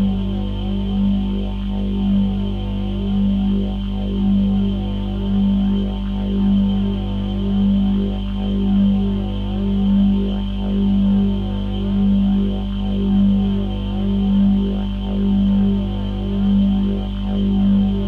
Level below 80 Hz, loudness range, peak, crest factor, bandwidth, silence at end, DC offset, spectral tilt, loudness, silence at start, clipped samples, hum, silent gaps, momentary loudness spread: -26 dBFS; 2 LU; -8 dBFS; 10 dB; 4.3 kHz; 0 s; under 0.1%; -10 dB/octave; -19 LUFS; 0 s; under 0.1%; 50 Hz at -25 dBFS; none; 7 LU